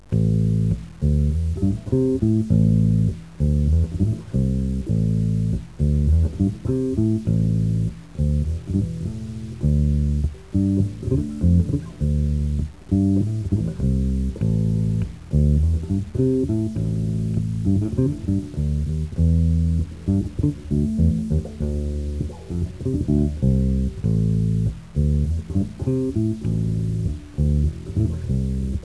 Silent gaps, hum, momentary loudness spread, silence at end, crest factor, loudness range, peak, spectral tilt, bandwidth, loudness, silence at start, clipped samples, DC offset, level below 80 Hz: none; none; 6 LU; 0 s; 14 dB; 3 LU; -6 dBFS; -10 dB/octave; 11 kHz; -22 LUFS; 0.1 s; under 0.1%; 0.4%; -28 dBFS